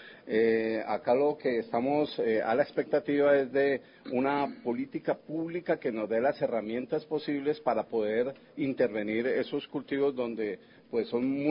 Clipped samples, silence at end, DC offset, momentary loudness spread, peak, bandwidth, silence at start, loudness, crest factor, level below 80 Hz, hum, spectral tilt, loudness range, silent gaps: under 0.1%; 0 s; under 0.1%; 8 LU; -12 dBFS; 5.4 kHz; 0 s; -30 LUFS; 18 dB; -72 dBFS; none; -10 dB/octave; 4 LU; none